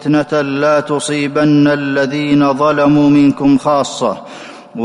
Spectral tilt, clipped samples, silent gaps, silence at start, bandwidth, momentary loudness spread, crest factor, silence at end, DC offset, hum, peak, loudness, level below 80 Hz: -6 dB/octave; under 0.1%; none; 0 s; 11 kHz; 9 LU; 10 dB; 0 s; under 0.1%; none; -4 dBFS; -12 LUFS; -50 dBFS